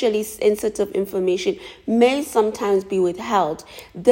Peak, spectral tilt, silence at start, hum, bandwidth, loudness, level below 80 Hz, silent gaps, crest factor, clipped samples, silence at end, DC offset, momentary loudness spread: -2 dBFS; -5 dB/octave; 0 s; none; 16.5 kHz; -21 LUFS; -56 dBFS; none; 18 dB; under 0.1%; 0 s; under 0.1%; 8 LU